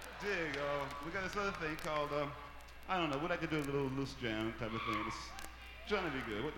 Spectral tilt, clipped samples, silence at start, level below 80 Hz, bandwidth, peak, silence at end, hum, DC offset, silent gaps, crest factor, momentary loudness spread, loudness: -5 dB/octave; under 0.1%; 0 s; -56 dBFS; 17 kHz; -22 dBFS; 0 s; none; under 0.1%; none; 18 dB; 11 LU; -39 LUFS